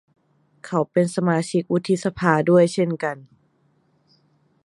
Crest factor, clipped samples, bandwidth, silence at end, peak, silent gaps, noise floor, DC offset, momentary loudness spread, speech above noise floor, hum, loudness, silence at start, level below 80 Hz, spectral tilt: 22 dB; under 0.1%; 11.5 kHz; 1.4 s; -2 dBFS; none; -63 dBFS; under 0.1%; 10 LU; 43 dB; none; -21 LUFS; 0.65 s; -60 dBFS; -6.5 dB/octave